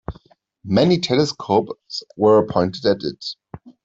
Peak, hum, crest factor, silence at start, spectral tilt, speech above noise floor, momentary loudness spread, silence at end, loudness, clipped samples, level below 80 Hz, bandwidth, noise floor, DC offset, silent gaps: -4 dBFS; none; 16 dB; 0.1 s; -6 dB/octave; 33 dB; 15 LU; 0.15 s; -19 LUFS; under 0.1%; -50 dBFS; 7.8 kHz; -52 dBFS; under 0.1%; none